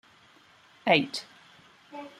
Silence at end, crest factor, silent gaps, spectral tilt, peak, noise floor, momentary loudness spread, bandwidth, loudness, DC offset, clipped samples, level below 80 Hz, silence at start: 0.1 s; 26 dB; none; -4.5 dB/octave; -6 dBFS; -58 dBFS; 23 LU; 14.5 kHz; -27 LUFS; under 0.1%; under 0.1%; -74 dBFS; 0.85 s